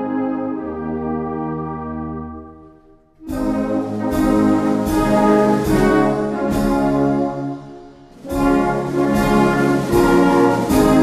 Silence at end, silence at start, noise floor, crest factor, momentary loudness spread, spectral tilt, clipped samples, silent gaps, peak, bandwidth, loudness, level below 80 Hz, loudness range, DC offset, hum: 0 s; 0 s; -48 dBFS; 14 dB; 13 LU; -6.5 dB/octave; under 0.1%; none; -2 dBFS; 14 kHz; -17 LUFS; -34 dBFS; 9 LU; under 0.1%; none